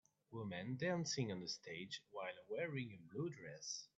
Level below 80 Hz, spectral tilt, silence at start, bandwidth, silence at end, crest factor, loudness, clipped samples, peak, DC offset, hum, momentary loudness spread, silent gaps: -84 dBFS; -4.5 dB/octave; 0.3 s; 8.4 kHz; 0.1 s; 18 dB; -46 LUFS; under 0.1%; -28 dBFS; under 0.1%; none; 9 LU; none